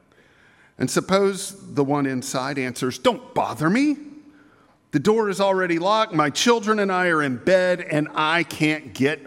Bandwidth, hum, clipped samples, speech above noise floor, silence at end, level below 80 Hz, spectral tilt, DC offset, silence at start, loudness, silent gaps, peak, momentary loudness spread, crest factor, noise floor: 16.5 kHz; none; under 0.1%; 35 dB; 0 s; -64 dBFS; -4.5 dB/octave; under 0.1%; 0.8 s; -21 LUFS; none; -4 dBFS; 7 LU; 18 dB; -56 dBFS